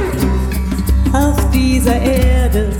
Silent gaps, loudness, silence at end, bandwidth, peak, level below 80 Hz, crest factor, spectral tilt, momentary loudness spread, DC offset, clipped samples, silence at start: none; -14 LUFS; 0 s; 18 kHz; 0 dBFS; -16 dBFS; 12 dB; -6.5 dB/octave; 4 LU; under 0.1%; under 0.1%; 0 s